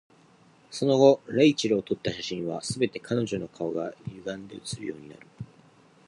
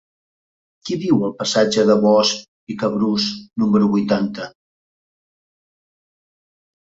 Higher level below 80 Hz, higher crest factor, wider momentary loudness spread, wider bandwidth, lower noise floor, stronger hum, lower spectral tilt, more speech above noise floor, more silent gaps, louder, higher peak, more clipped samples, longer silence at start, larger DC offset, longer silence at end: about the same, -62 dBFS vs -60 dBFS; about the same, 22 dB vs 18 dB; first, 21 LU vs 14 LU; first, 11.5 kHz vs 7.8 kHz; second, -58 dBFS vs under -90 dBFS; neither; about the same, -5.5 dB/octave vs -5 dB/octave; second, 32 dB vs over 73 dB; second, none vs 2.48-2.67 s; second, -26 LUFS vs -18 LUFS; second, -6 dBFS vs -2 dBFS; neither; second, 0.7 s vs 0.85 s; neither; second, 0.65 s vs 2.35 s